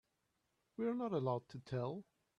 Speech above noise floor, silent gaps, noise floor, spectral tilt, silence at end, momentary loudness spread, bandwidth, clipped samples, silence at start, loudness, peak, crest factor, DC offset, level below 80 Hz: 44 dB; none; -84 dBFS; -9 dB/octave; 0.35 s; 10 LU; 7.8 kHz; under 0.1%; 0.8 s; -42 LUFS; -26 dBFS; 18 dB; under 0.1%; -78 dBFS